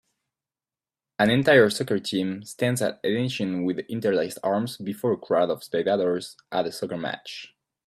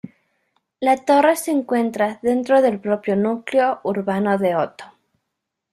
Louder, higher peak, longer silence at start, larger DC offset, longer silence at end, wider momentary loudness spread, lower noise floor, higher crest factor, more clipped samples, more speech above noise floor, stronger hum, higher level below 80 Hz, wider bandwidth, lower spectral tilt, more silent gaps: second, -25 LUFS vs -19 LUFS; about the same, -4 dBFS vs -4 dBFS; first, 1.2 s vs 0.05 s; neither; second, 0.4 s vs 0.85 s; first, 12 LU vs 7 LU; first, under -90 dBFS vs -79 dBFS; first, 22 dB vs 16 dB; neither; first, over 66 dB vs 61 dB; neither; about the same, -66 dBFS vs -64 dBFS; about the same, 15 kHz vs 14.5 kHz; about the same, -5 dB/octave vs -5.5 dB/octave; neither